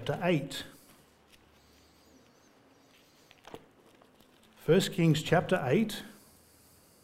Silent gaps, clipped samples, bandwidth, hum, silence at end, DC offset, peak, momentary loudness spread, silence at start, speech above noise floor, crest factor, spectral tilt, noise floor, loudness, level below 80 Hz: none; under 0.1%; 16 kHz; none; 0.9 s; under 0.1%; -12 dBFS; 25 LU; 0 s; 34 dB; 22 dB; -6 dB/octave; -62 dBFS; -29 LUFS; -62 dBFS